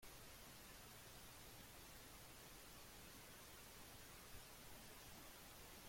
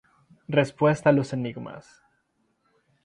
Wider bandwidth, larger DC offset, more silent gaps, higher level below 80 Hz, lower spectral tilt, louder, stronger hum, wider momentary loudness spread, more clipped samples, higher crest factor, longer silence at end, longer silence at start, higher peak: first, 16.5 kHz vs 10.5 kHz; neither; neither; second, -70 dBFS vs -64 dBFS; second, -2.5 dB/octave vs -7 dB/octave; second, -59 LUFS vs -24 LUFS; neither; second, 1 LU vs 19 LU; neither; second, 16 dB vs 22 dB; second, 0 s vs 1.25 s; second, 0 s vs 0.5 s; second, -44 dBFS vs -6 dBFS